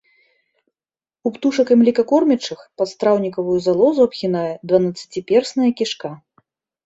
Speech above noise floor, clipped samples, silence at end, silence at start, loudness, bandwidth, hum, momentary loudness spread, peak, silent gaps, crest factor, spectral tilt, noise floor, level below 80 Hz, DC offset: over 73 dB; under 0.1%; 0.7 s; 1.25 s; -18 LUFS; 8 kHz; none; 12 LU; -2 dBFS; none; 16 dB; -6 dB/octave; under -90 dBFS; -62 dBFS; under 0.1%